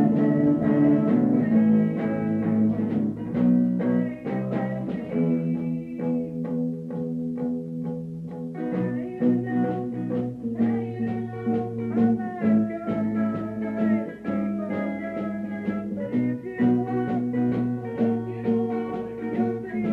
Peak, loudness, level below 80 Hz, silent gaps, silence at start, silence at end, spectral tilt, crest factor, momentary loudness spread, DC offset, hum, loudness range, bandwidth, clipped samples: -10 dBFS; -25 LUFS; -60 dBFS; none; 0 s; 0 s; -10.5 dB/octave; 14 dB; 9 LU; under 0.1%; none; 6 LU; 4.1 kHz; under 0.1%